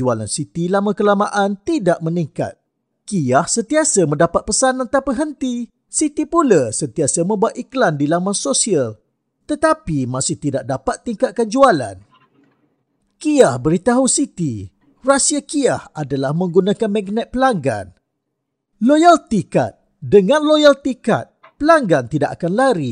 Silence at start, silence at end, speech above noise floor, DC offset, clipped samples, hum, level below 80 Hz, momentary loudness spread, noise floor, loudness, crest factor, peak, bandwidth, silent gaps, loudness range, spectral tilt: 0 s; 0 s; 59 dB; under 0.1%; under 0.1%; none; -48 dBFS; 10 LU; -75 dBFS; -17 LUFS; 16 dB; 0 dBFS; 10.5 kHz; none; 4 LU; -4.5 dB/octave